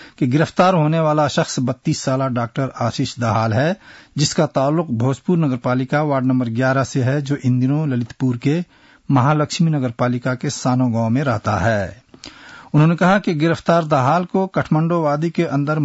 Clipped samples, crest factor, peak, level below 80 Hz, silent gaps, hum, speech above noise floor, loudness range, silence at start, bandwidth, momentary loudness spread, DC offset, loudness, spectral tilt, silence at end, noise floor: under 0.1%; 14 dB; -4 dBFS; -54 dBFS; none; none; 23 dB; 2 LU; 0 s; 8 kHz; 6 LU; under 0.1%; -18 LUFS; -6.5 dB/octave; 0 s; -40 dBFS